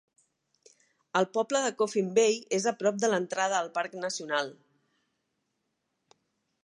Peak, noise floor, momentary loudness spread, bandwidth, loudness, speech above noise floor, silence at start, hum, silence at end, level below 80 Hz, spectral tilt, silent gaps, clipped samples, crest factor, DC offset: -10 dBFS; -80 dBFS; 8 LU; 11.5 kHz; -29 LUFS; 52 dB; 1.15 s; none; 2.15 s; -82 dBFS; -3 dB/octave; none; under 0.1%; 20 dB; under 0.1%